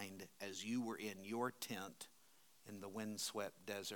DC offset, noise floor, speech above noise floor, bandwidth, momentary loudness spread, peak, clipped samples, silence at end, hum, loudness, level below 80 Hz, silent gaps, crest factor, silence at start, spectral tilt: under 0.1%; -72 dBFS; 25 dB; 19 kHz; 13 LU; -30 dBFS; under 0.1%; 0 s; none; -47 LUFS; under -90 dBFS; none; 18 dB; 0 s; -3.5 dB/octave